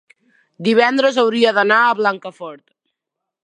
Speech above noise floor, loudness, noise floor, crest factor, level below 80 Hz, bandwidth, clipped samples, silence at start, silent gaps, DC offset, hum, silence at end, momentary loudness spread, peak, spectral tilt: 66 dB; -15 LUFS; -81 dBFS; 16 dB; -74 dBFS; 10 kHz; under 0.1%; 0.6 s; none; under 0.1%; none; 0.9 s; 18 LU; 0 dBFS; -4.5 dB/octave